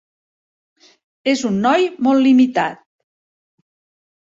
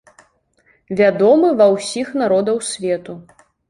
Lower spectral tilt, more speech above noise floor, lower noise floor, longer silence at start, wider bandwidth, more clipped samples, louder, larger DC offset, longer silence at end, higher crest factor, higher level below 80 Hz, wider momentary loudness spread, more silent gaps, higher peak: about the same, -5 dB/octave vs -5 dB/octave; first, over 75 dB vs 43 dB; first, under -90 dBFS vs -59 dBFS; first, 1.25 s vs 0.9 s; second, 7.8 kHz vs 11.5 kHz; neither; about the same, -16 LUFS vs -16 LUFS; neither; first, 1.5 s vs 0.5 s; about the same, 16 dB vs 16 dB; about the same, -62 dBFS vs -60 dBFS; second, 10 LU vs 13 LU; neither; about the same, -4 dBFS vs -2 dBFS